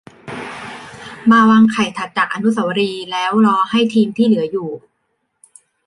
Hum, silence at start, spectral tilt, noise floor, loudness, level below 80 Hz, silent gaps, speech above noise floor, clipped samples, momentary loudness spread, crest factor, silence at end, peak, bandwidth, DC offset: none; 0.25 s; -5.5 dB/octave; -69 dBFS; -15 LUFS; -60 dBFS; none; 55 dB; under 0.1%; 20 LU; 16 dB; 1.1 s; -2 dBFS; 11 kHz; under 0.1%